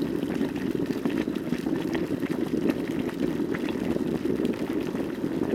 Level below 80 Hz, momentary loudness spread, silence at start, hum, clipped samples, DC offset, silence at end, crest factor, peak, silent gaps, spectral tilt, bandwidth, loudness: -52 dBFS; 2 LU; 0 s; none; under 0.1%; under 0.1%; 0 s; 18 dB; -10 dBFS; none; -7 dB/octave; 16.5 kHz; -28 LUFS